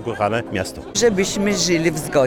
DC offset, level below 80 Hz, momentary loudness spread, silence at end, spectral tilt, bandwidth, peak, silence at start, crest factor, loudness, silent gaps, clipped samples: under 0.1%; -46 dBFS; 7 LU; 0 s; -4 dB/octave; 19 kHz; -4 dBFS; 0 s; 16 dB; -19 LUFS; none; under 0.1%